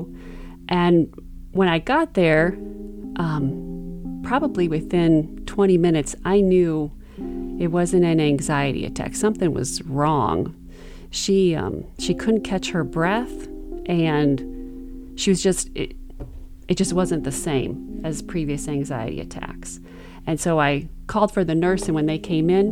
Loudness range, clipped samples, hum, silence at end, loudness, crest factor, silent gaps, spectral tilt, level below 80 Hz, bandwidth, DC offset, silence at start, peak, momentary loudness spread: 5 LU; under 0.1%; none; 0 s; -22 LUFS; 18 dB; none; -5.5 dB/octave; -38 dBFS; 14.5 kHz; under 0.1%; 0 s; -4 dBFS; 16 LU